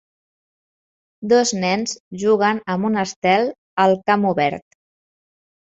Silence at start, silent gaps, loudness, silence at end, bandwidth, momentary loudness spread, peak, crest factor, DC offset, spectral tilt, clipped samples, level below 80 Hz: 1.2 s; 2.00-2.11 s, 3.16-3.22 s, 3.58-3.77 s; -19 LUFS; 1.1 s; 8.2 kHz; 7 LU; -2 dBFS; 18 dB; under 0.1%; -4.5 dB/octave; under 0.1%; -62 dBFS